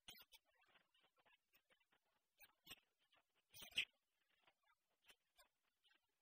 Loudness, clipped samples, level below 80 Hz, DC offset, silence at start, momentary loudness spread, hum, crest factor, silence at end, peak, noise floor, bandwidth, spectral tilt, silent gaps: -49 LUFS; under 0.1%; under -90 dBFS; under 0.1%; 0.1 s; 21 LU; none; 32 dB; 0.8 s; -30 dBFS; -88 dBFS; 15 kHz; 0.5 dB/octave; none